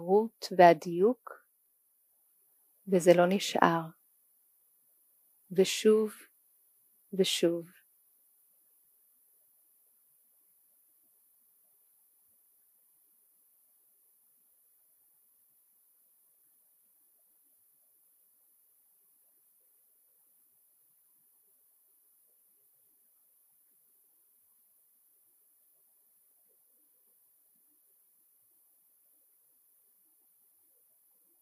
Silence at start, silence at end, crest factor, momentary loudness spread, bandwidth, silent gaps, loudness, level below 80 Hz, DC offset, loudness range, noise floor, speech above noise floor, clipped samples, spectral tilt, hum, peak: 0 s; 23.75 s; 30 dB; 26 LU; 15.5 kHz; none; -27 LUFS; under -90 dBFS; under 0.1%; 8 LU; -72 dBFS; 46 dB; under 0.1%; -5 dB/octave; none; -6 dBFS